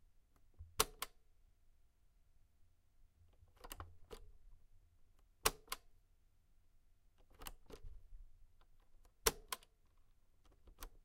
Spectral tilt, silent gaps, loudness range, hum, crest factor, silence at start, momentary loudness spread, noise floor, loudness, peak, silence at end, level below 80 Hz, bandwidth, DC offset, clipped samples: -1 dB/octave; none; 15 LU; none; 38 dB; 0.2 s; 22 LU; -71 dBFS; -42 LUFS; -14 dBFS; 0.05 s; -60 dBFS; 16 kHz; under 0.1%; under 0.1%